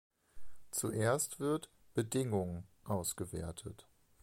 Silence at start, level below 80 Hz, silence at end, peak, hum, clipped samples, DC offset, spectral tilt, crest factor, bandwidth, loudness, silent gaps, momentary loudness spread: 0.35 s; -60 dBFS; 0.1 s; -20 dBFS; none; under 0.1%; under 0.1%; -5 dB/octave; 18 dB; 16.5 kHz; -38 LUFS; none; 14 LU